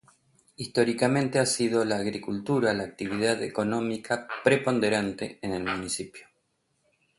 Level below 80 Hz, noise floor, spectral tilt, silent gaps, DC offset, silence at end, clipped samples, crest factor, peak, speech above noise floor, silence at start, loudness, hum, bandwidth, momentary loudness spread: -62 dBFS; -74 dBFS; -4.5 dB/octave; none; under 0.1%; 0.95 s; under 0.1%; 20 dB; -8 dBFS; 47 dB; 0.6 s; -27 LUFS; none; 11.5 kHz; 9 LU